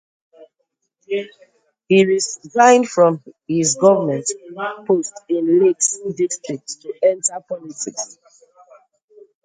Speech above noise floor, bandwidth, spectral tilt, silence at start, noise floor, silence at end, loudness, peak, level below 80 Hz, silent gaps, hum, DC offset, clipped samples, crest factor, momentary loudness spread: 55 dB; 9.6 kHz; -4 dB/octave; 0.4 s; -73 dBFS; 1.4 s; -18 LUFS; 0 dBFS; -68 dBFS; none; none; under 0.1%; under 0.1%; 18 dB; 15 LU